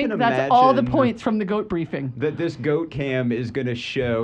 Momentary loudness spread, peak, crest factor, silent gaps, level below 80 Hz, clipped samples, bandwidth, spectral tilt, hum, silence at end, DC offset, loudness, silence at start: 10 LU; -4 dBFS; 16 dB; none; -50 dBFS; under 0.1%; 9 kHz; -7.5 dB/octave; none; 0 s; under 0.1%; -22 LUFS; 0 s